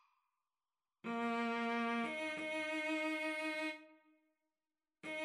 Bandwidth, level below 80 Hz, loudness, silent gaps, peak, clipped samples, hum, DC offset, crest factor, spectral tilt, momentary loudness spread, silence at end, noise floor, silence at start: 13.5 kHz; under -90 dBFS; -39 LUFS; none; -28 dBFS; under 0.1%; none; under 0.1%; 14 dB; -3.5 dB/octave; 8 LU; 0 s; under -90 dBFS; 1.05 s